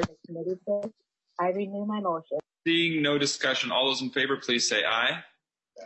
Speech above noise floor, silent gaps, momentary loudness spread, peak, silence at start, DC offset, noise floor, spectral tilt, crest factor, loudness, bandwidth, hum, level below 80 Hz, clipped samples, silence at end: 26 dB; none; 11 LU; -10 dBFS; 0 s; under 0.1%; -53 dBFS; -3 dB/octave; 20 dB; -27 LUFS; 8.4 kHz; none; -70 dBFS; under 0.1%; 0 s